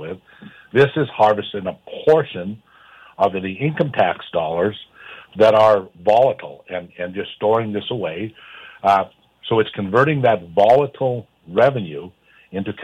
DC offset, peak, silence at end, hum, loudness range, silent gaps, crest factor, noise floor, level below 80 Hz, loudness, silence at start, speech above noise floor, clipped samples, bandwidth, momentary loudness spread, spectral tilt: under 0.1%; -4 dBFS; 0 s; none; 4 LU; none; 16 dB; -47 dBFS; -60 dBFS; -18 LUFS; 0 s; 29 dB; under 0.1%; 9.2 kHz; 17 LU; -7.5 dB/octave